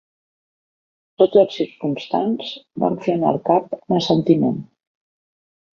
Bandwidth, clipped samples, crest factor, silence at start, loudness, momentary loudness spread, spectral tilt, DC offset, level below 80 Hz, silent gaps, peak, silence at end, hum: 7 kHz; under 0.1%; 18 dB; 1.2 s; -19 LUFS; 9 LU; -7.5 dB/octave; under 0.1%; -62 dBFS; none; -2 dBFS; 1.1 s; none